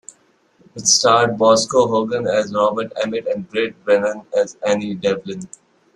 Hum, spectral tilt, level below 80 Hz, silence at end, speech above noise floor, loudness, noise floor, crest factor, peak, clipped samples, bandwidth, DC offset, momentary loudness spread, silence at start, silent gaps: none; -3 dB/octave; -60 dBFS; 0.5 s; 39 dB; -17 LUFS; -57 dBFS; 18 dB; -2 dBFS; under 0.1%; 12.5 kHz; under 0.1%; 9 LU; 0.75 s; none